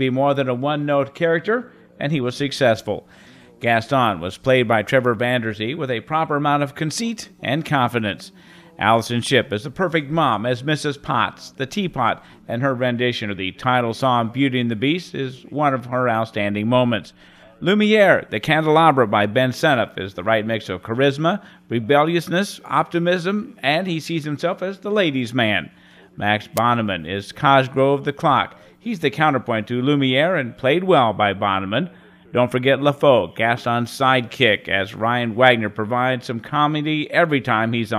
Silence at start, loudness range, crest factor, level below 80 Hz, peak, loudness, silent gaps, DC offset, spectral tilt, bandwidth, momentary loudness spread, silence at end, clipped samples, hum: 0 s; 4 LU; 20 dB; -58 dBFS; 0 dBFS; -19 LUFS; none; under 0.1%; -5.5 dB/octave; 15.5 kHz; 9 LU; 0 s; under 0.1%; none